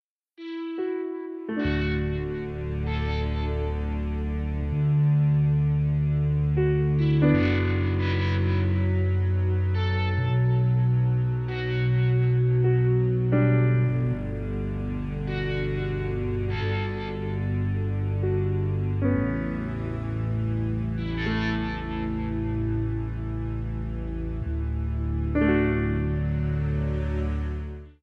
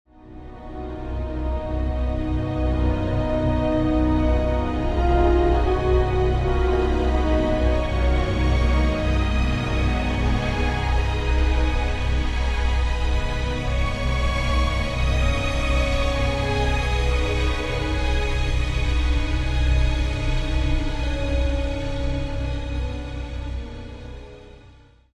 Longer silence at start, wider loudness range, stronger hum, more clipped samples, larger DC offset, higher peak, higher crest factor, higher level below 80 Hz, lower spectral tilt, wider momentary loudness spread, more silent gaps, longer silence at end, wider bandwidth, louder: first, 0.4 s vs 0.25 s; about the same, 6 LU vs 5 LU; neither; neither; neither; second, -10 dBFS vs -6 dBFS; about the same, 14 dB vs 14 dB; second, -34 dBFS vs -24 dBFS; first, -9.5 dB/octave vs -6.5 dB/octave; about the same, 9 LU vs 9 LU; neither; second, 0.1 s vs 0.5 s; second, 5.8 kHz vs 10.5 kHz; second, -26 LUFS vs -23 LUFS